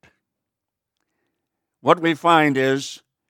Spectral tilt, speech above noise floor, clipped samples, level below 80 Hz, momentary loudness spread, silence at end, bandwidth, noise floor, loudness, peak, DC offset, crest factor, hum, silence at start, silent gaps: -5 dB/octave; 66 dB; under 0.1%; -76 dBFS; 10 LU; 0.35 s; 16.5 kHz; -84 dBFS; -18 LUFS; 0 dBFS; under 0.1%; 22 dB; none; 1.85 s; none